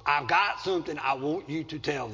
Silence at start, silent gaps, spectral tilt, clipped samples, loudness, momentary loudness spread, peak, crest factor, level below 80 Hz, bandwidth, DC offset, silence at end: 0 s; none; -5 dB/octave; under 0.1%; -28 LUFS; 8 LU; -10 dBFS; 18 dB; -60 dBFS; 7.6 kHz; under 0.1%; 0 s